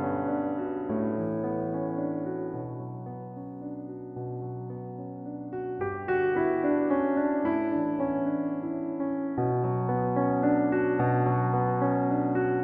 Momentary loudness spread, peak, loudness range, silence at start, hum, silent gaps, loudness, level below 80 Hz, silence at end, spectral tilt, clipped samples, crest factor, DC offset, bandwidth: 13 LU; -14 dBFS; 10 LU; 0 s; none; none; -29 LUFS; -62 dBFS; 0 s; -12.5 dB/octave; under 0.1%; 14 dB; under 0.1%; 3.6 kHz